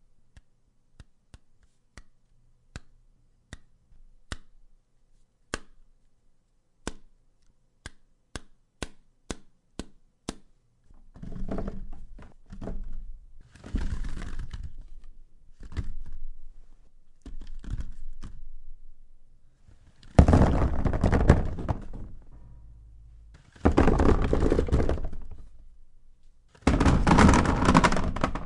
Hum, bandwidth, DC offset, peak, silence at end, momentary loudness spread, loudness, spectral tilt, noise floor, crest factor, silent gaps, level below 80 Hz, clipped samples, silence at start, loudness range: none; 11 kHz; under 0.1%; 0 dBFS; 0 s; 27 LU; -25 LUFS; -6.5 dB/octave; -64 dBFS; 28 dB; none; -34 dBFS; under 0.1%; 1 s; 21 LU